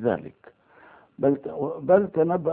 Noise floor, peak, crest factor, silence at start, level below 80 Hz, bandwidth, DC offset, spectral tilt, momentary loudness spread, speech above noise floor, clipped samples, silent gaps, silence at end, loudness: -53 dBFS; -6 dBFS; 20 dB; 0 s; -64 dBFS; 3.7 kHz; under 0.1%; -12.5 dB/octave; 11 LU; 30 dB; under 0.1%; none; 0 s; -24 LUFS